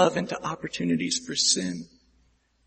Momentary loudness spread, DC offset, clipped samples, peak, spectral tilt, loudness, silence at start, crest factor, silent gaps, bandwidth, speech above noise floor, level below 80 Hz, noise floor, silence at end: 11 LU; under 0.1%; under 0.1%; -6 dBFS; -3 dB/octave; -26 LUFS; 0 s; 22 dB; none; 8.8 kHz; 39 dB; -62 dBFS; -65 dBFS; 0.8 s